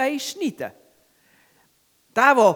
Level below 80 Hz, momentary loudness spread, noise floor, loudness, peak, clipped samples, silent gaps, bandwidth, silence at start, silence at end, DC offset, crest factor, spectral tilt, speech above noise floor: -76 dBFS; 19 LU; -63 dBFS; -21 LUFS; -2 dBFS; under 0.1%; none; over 20 kHz; 0 s; 0 s; under 0.1%; 20 dB; -3.5 dB/octave; 44 dB